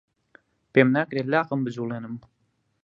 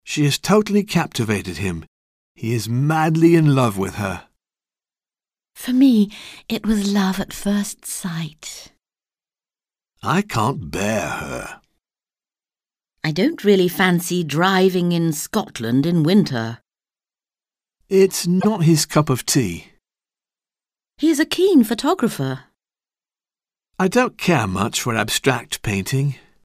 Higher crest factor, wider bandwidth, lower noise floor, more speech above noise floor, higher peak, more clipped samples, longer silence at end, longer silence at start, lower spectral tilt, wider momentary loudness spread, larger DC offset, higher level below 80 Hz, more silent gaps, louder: first, 24 dB vs 18 dB; second, 7.2 kHz vs 16 kHz; second, -59 dBFS vs under -90 dBFS; second, 36 dB vs over 72 dB; about the same, -2 dBFS vs -2 dBFS; neither; first, 0.65 s vs 0.3 s; first, 0.75 s vs 0.05 s; first, -8 dB/octave vs -5.5 dB/octave; first, 16 LU vs 12 LU; neither; second, -70 dBFS vs -50 dBFS; second, none vs 1.87-2.35 s; second, -24 LUFS vs -19 LUFS